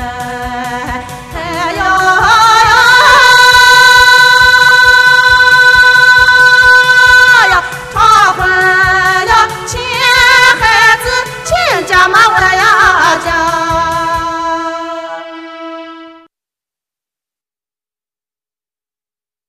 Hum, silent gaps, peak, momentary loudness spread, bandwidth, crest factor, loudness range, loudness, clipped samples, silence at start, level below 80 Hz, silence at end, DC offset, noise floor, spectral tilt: none; none; 0 dBFS; 16 LU; 16 kHz; 8 dB; 12 LU; -6 LUFS; 1%; 0 s; -32 dBFS; 3.4 s; under 0.1%; under -90 dBFS; -1.5 dB/octave